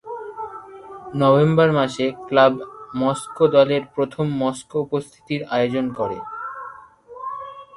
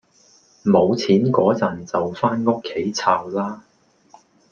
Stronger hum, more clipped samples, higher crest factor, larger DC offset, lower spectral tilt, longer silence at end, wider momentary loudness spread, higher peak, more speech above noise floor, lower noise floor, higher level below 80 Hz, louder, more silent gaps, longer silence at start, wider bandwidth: neither; neither; about the same, 18 dB vs 18 dB; neither; about the same, -6.5 dB/octave vs -6.5 dB/octave; second, 0 s vs 0.95 s; first, 18 LU vs 9 LU; about the same, -2 dBFS vs -2 dBFS; second, 23 dB vs 36 dB; second, -42 dBFS vs -55 dBFS; about the same, -58 dBFS vs -62 dBFS; about the same, -20 LUFS vs -20 LUFS; neither; second, 0.05 s vs 0.65 s; first, 11.5 kHz vs 7.2 kHz